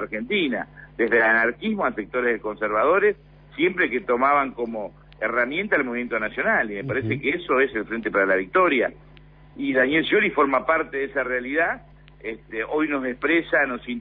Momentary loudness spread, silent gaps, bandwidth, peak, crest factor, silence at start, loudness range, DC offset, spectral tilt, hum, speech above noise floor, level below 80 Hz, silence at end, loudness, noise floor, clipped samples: 11 LU; none; 5 kHz; -8 dBFS; 14 dB; 0 s; 2 LU; under 0.1%; -9 dB/octave; none; 26 dB; -52 dBFS; 0 s; -22 LUFS; -48 dBFS; under 0.1%